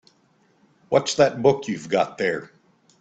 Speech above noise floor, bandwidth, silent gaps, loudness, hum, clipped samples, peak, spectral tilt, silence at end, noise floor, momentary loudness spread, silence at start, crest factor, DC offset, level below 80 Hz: 41 dB; 8.8 kHz; none; -22 LUFS; none; under 0.1%; -2 dBFS; -4.5 dB/octave; 0.55 s; -62 dBFS; 8 LU; 0.9 s; 22 dB; under 0.1%; -64 dBFS